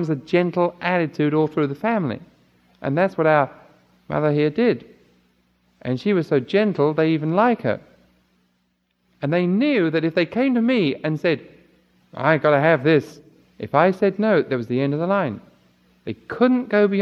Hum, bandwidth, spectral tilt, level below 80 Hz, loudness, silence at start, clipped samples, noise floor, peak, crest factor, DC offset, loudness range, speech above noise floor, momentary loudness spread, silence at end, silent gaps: none; 7.2 kHz; -8.5 dB/octave; -64 dBFS; -20 LUFS; 0 s; under 0.1%; -69 dBFS; -2 dBFS; 20 dB; under 0.1%; 3 LU; 49 dB; 11 LU; 0 s; none